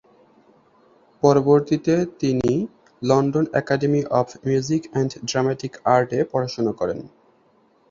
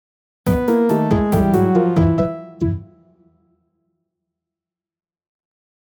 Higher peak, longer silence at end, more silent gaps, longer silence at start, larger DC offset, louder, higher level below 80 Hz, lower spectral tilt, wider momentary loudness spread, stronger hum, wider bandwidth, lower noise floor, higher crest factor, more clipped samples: about the same, -2 dBFS vs -4 dBFS; second, 0.85 s vs 3 s; neither; first, 1.25 s vs 0.45 s; neither; second, -21 LUFS vs -17 LUFS; second, -56 dBFS vs -36 dBFS; second, -6.5 dB/octave vs -9 dB/octave; about the same, 8 LU vs 9 LU; neither; second, 7.6 kHz vs 19 kHz; second, -59 dBFS vs -89 dBFS; about the same, 20 dB vs 16 dB; neither